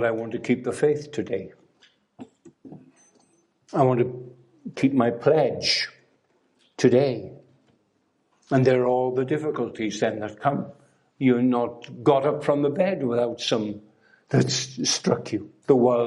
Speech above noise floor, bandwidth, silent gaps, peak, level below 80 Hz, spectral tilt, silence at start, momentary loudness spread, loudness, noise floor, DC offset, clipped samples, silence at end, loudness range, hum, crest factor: 46 dB; 11.5 kHz; none; -4 dBFS; -68 dBFS; -5 dB/octave; 0 s; 12 LU; -24 LUFS; -69 dBFS; under 0.1%; under 0.1%; 0 s; 6 LU; none; 20 dB